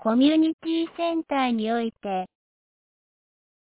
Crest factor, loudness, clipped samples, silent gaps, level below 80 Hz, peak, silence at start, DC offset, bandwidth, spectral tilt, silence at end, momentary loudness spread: 16 dB; -24 LUFS; under 0.1%; 0.53-0.59 s; -66 dBFS; -10 dBFS; 0 s; under 0.1%; 4 kHz; -9.5 dB/octave; 1.4 s; 11 LU